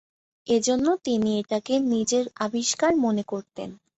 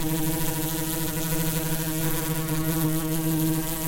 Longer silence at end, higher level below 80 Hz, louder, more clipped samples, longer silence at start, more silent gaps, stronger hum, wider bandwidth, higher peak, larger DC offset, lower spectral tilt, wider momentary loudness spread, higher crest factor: first, 0.25 s vs 0 s; second, -62 dBFS vs -38 dBFS; about the same, -24 LUFS vs -26 LUFS; neither; first, 0.45 s vs 0 s; neither; neither; second, 8.2 kHz vs 17 kHz; about the same, -10 dBFS vs -12 dBFS; neither; about the same, -4 dB/octave vs -4.5 dB/octave; first, 11 LU vs 2 LU; about the same, 14 dB vs 14 dB